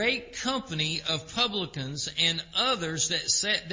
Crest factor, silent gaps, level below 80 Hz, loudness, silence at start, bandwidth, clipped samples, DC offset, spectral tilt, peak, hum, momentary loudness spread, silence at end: 18 dB; none; -58 dBFS; -27 LUFS; 0 s; 7.8 kHz; under 0.1%; under 0.1%; -2 dB/octave; -12 dBFS; none; 7 LU; 0 s